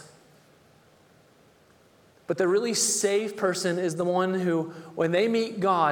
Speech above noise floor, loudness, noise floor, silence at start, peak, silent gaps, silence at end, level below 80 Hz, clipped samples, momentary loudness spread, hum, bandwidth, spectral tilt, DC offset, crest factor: 34 dB; -25 LUFS; -59 dBFS; 0 s; -10 dBFS; none; 0 s; -74 dBFS; under 0.1%; 7 LU; none; 18.5 kHz; -4 dB/octave; under 0.1%; 18 dB